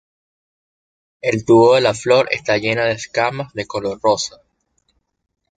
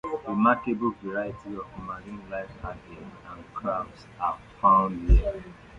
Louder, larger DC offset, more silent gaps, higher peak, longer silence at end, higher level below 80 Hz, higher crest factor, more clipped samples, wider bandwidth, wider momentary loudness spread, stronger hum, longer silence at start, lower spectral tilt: first, -17 LUFS vs -27 LUFS; neither; neither; first, -2 dBFS vs -8 dBFS; first, 1.3 s vs 0 s; second, -54 dBFS vs -32 dBFS; about the same, 16 dB vs 20 dB; neither; first, 9.4 kHz vs 6.4 kHz; second, 12 LU vs 19 LU; neither; first, 1.25 s vs 0.05 s; second, -4.5 dB/octave vs -9 dB/octave